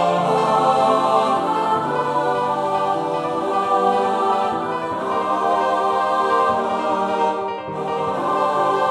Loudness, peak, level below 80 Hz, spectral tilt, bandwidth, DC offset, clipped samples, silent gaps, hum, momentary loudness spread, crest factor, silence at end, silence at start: -19 LUFS; -4 dBFS; -60 dBFS; -5.5 dB/octave; 13 kHz; under 0.1%; under 0.1%; none; none; 6 LU; 14 dB; 0 s; 0 s